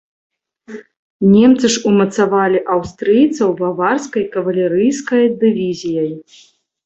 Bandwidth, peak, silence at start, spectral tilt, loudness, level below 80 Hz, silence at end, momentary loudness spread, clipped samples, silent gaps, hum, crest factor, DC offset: 8.2 kHz; -2 dBFS; 0.7 s; -5.5 dB/octave; -14 LUFS; -54 dBFS; 0.65 s; 11 LU; under 0.1%; 0.99-1.20 s; none; 14 dB; under 0.1%